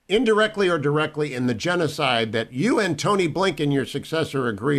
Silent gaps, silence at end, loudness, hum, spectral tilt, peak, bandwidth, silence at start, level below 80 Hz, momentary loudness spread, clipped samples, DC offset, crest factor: none; 0 s; -22 LUFS; none; -5.5 dB/octave; -8 dBFS; 14 kHz; 0.1 s; -54 dBFS; 5 LU; under 0.1%; under 0.1%; 14 dB